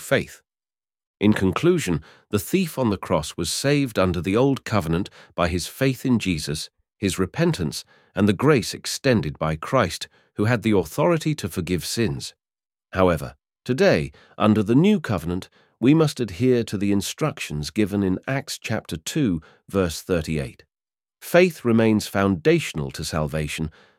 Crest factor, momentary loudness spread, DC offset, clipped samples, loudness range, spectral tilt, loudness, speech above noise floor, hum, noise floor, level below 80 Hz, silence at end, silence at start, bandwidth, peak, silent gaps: 20 dB; 10 LU; under 0.1%; under 0.1%; 4 LU; -5.5 dB/octave; -22 LUFS; over 68 dB; none; under -90 dBFS; -46 dBFS; 0.3 s; 0 s; 17 kHz; -2 dBFS; 1.07-1.14 s